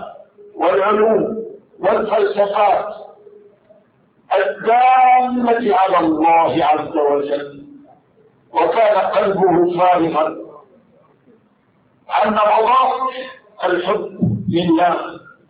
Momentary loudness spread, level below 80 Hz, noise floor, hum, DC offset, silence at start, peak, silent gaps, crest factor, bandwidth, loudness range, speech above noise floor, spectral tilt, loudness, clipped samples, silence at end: 11 LU; -56 dBFS; -57 dBFS; none; under 0.1%; 0 s; -4 dBFS; none; 12 dB; 5 kHz; 4 LU; 42 dB; -11 dB/octave; -16 LUFS; under 0.1%; 0.3 s